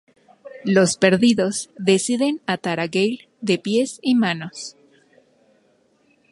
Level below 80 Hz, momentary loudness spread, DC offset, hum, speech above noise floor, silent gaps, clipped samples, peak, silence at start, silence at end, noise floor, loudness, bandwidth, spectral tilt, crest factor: -64 dBFS; 12 LU; under 0.1%; none; 41 dB; none; under 0.1%; -2 dBFS; 0.45 s; 1.6 s; -61 dBFS; -20 LUFS; 11.5 kHz; -4.5 dB/octave; 20 dB